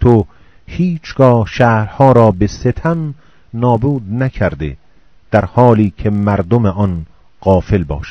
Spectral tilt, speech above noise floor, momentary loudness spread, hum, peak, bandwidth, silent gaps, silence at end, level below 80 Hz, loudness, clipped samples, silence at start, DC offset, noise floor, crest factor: -8.5 dB/octave; 38 dB; 10 LU; none; 0 dBFS; 6.6 kHz; none; 0 s; -32 dBFS; -13 LUFS; 0.6%; 0 s; 0.6%; -50 dBFS; 14 dB